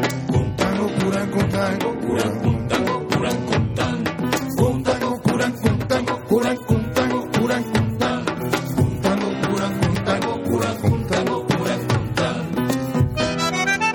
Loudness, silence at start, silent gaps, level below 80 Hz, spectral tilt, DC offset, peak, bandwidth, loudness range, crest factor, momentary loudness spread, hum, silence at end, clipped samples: -21 LUFS; 0 s; none; -42 dBFS; -6 dB/octave; under 0.1%; -4 dBFS; 19 kHz; 1 LU; 18 dB; 2 LU; none; 0 s; under 0.1%